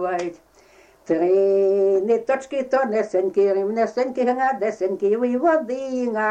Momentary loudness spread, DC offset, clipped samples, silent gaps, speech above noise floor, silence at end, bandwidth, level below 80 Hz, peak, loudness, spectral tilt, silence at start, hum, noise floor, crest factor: 7 LU; under 0.1%; under 0.1%; none; 32 dB; 0 s; 8.4 kHz; -66 dBFS; -8 dBFS; -21 LUFS; -6 dB/octave; 0 s; none; -52 dBFS; 12 dB